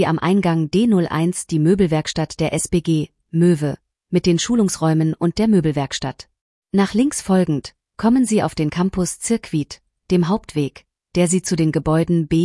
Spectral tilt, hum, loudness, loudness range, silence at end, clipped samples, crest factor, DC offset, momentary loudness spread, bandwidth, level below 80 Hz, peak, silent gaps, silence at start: -6 dB/octave; none; -19 LUFS; 2 LU; 0 s; under 0.1%; 14 dB; under 0.1%; 8 LU; 12 kHz; -44 dBFS; -4 dBFS; 6.41-6.62 s; 0 s